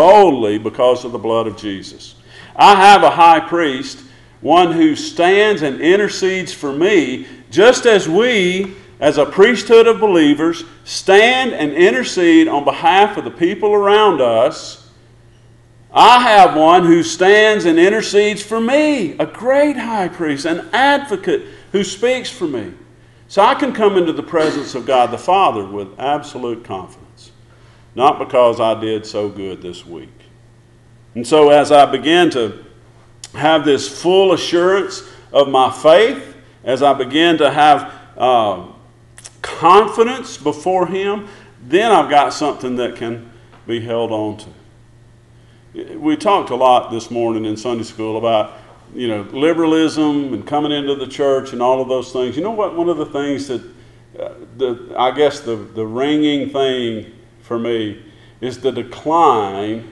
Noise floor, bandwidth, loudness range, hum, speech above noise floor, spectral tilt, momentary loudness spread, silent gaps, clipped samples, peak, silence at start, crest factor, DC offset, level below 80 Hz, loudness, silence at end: -46 dBFS; 12 kHz; 8 LU; none; 32 dB; -4.5 dB/octave; 16 LU; none; under 0.1%; 0 dBFS; 0 s; 14 dB; under 0.1%; -52 dBFS; -14 LUFS; 0 s